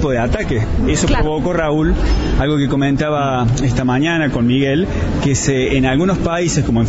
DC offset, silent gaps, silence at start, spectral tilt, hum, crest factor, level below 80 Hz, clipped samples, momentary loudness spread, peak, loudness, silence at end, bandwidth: 0.4%; none; 0 s; -5.5 dB/octave; none; 12 dB; -22 dBFS; under 0.1%; 3 LU; -2 dBFS; -16 LUFS; 0 s; 8 kHz